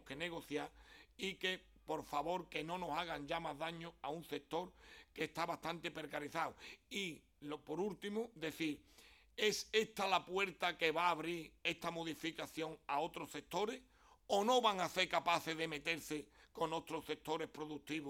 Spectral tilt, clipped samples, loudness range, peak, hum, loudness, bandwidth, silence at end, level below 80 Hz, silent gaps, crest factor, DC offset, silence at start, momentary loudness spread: -3.5 dB/octave; under 0.1%; 6 LU; -20 dBFS; none; -41 LUFS; 17 kHz; 0 s; -72 dBFS; none; 22 dB; under 0.1%; 0.05 s; 11 LU